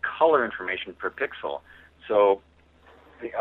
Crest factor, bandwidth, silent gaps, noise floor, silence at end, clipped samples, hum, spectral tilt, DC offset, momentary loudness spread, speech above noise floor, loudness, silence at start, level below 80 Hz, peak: 20 dB; 4.1 kHz; none; -55 dBFS; 0 s; under 0.1%; none; -6.5 dB/octave; under 0.1%; 16 LU; 31 dB; -25 LUFS; 0.05 s; -62 dBFS; -6 dBFS